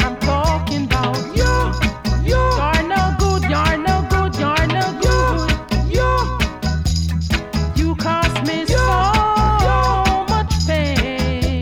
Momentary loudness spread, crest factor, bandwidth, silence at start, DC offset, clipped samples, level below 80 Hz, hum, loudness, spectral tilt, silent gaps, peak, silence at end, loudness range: 5 LU; 10 dB; 16.5 kHz; 0 s; under 0.1%; under 0.1%; -22 dBFS; none; -17 LUFS; -5.5 dB/octave; none; -6 dBFS; 0 s; 2 LU